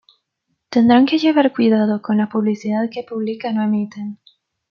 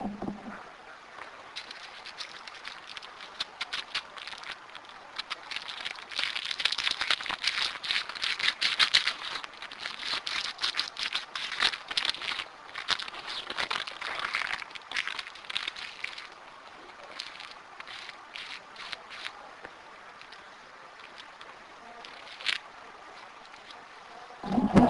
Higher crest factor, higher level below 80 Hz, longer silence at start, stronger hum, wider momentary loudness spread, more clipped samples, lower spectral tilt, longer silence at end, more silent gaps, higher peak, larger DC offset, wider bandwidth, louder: second, 16 dB vs 30 dB; second, -66 dBFS vs -60 dBFS; first, 0.7 s vs 0 s; neither; second, 12 LU vs 19 LU; neither; first, -7 dB/octave vs -3 dB/octave; first, 0.55 s vs 0 s; neither; first, -2 dBFS vs -6 dBFS; neither; second, 6.8 kHz vs 11.5 kHz; first, -17 LUFS vs -32 LUFS